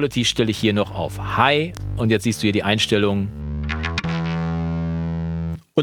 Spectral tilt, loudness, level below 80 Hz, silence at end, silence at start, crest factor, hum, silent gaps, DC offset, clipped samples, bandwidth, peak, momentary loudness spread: -5 dB/octave; -21 LUFS; -36 dBFS; 0 s; 0 s; 20 dB; none; none; under 0.1%; under 0.1%; 17.5 kHz; -2 dBFS; 9 LU